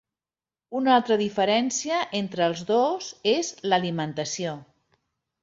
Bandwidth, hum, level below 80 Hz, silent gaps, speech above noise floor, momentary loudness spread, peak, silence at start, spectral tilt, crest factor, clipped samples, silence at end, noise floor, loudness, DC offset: 8 kHz; none; -70 dBFS; none; over 66 dB; 8 LU; -6 dBFS; 0.7 s; -4 dB/octave; 18 dB; under 0.1%; 0.8 s; under -90 dBFS; -25 LUFS; under 0.1%